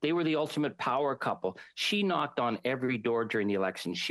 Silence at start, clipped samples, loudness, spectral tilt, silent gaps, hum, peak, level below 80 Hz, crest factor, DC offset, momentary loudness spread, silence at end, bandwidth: 0 s; under 0.1%; -31 LUFS; -5 dB/octave; none; none; -16 dBFS; -76 dBFS; 14 dB; under 0.1%; 4 LU; 0 s; 12.5 kHz